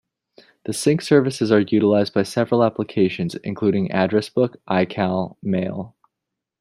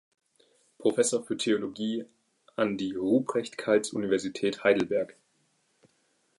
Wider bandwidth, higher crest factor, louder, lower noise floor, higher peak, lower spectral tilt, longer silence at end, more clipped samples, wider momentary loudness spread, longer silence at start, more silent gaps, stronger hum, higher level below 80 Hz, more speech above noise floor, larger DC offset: first, 14 kHz vs 11.5 kHz; about the same, 18 dB vs 20 dB; first, -20 LUFS vs -28 LUFS; first, -83 dBFS vs -71 dBFS; first, -2 dBFS vs -10 dBFS; first, -6.5 dB/octave vs -4 dB/octave; second, 0.75 s vs 1.3 s; neither; about the same, 9 LU vs 7 LU; second, 0.65 s vs 0.8 s; neither; neither; first, -62 dBFS vs -72 dBFS; first, 63 dB vs 44 dB; neither